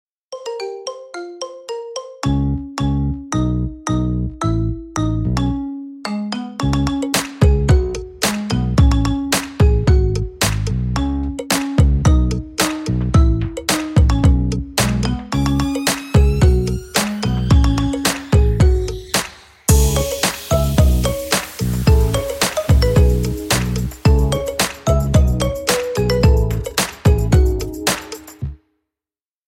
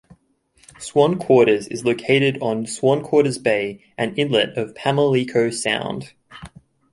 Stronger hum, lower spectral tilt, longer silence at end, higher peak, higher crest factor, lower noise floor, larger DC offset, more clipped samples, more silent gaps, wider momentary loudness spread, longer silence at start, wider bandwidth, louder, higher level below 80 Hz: neither; about the same, -5.5 dB/octave vs -5 dB/octave; first, 0.95 s vs 0.45 s; about the same, 0 dBFS vs -2 dBFS; about the same, 16 dB vs 18 dB; first, under -90 dBFS vs -59 dBFS; neither; neither; neither; about the same, 11 LU vs 10 LU; second, 0.3 s vs 0.8 s; first, 17 kHz vs 11.5 kHz; about the same, -17 LUFS vs -19 LUFS; first, -20 dBFS vs -58 dBFS